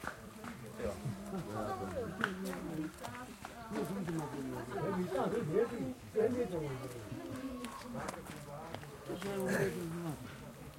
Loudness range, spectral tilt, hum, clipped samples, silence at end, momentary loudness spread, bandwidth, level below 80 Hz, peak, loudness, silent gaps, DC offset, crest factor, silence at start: 4 LU; -6 dB/octave; none; under 0.1%; 0 s; 12 LU; 16.5 kHz; -62 dBFS; -14 dBFS; -40 LUFS; none; under 0.1%; 26 dB; 0 s